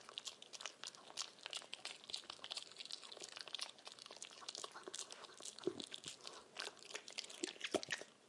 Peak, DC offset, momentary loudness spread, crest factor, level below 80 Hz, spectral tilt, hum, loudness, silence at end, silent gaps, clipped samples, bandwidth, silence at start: -24 dBFS; under 0.1%; 6 LU; 28 dB; under -90 dBFS; -1 dB/octave; none; -49 LUFS; 0 s; none; under 0.1%; 11.5 kHz; 0 s